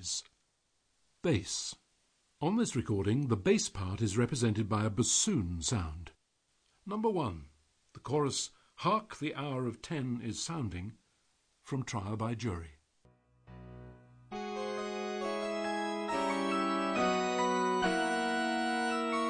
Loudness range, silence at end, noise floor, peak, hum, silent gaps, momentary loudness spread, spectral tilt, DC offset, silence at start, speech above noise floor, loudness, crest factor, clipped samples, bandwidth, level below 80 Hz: 9 LU; 0 s; -77 dBFS; -16 dBFS; none; none; 13 LU; -4.5 dB/octave; under 0.1%; 0 s; 43 dB; -33 LUFS; 18 dB; under 0.1%; 10 kHz; -58 dBFS